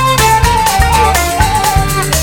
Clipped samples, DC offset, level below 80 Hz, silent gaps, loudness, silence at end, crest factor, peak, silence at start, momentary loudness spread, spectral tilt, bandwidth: under 0.1%; under 0.1%; -18 dBFS; none; -10 LUFS; 0 s; 10 dB; 0 dBFS; 0 s; 3 LU; -3.5 dB/octave; 19 kHz